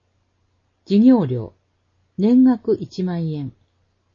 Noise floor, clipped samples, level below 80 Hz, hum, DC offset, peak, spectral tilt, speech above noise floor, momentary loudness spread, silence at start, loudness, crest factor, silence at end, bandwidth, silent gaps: -66 dBFS; under 0.1%; -60 dBFS; none; under 0.1%; -4 dBFS; -9.5 dB/octave; 49 dB; 18 LU; 0.9 s; -18 LUFS; 16 dB; 0.65 s; 6.8 kHz; none